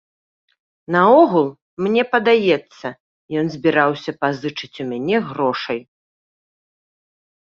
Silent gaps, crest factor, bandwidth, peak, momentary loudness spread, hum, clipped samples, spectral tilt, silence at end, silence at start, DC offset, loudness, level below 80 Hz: 1.62-1.77 s, 3.00-3.28 s; 18 dB; 7 kHz; -2 dBFS; 15 LU; none; under 0.1%; -7 dB/octave; 1.6 s; 0.9 s; under 0.1%; -18 LUFS; -64 dBFS